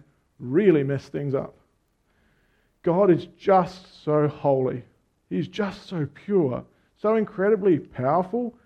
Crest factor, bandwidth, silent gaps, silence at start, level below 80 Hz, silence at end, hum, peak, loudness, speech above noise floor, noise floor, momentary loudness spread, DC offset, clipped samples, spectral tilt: 18 dB; 7.6 kHz; none; 0.4 s; -62 dBFS; 0.15 s; none; -6 dBFS; -24 LUFS; 45 dB; -68 dBFS; 11 LU; under 0.1%; under 0.1%; -9 dB/octave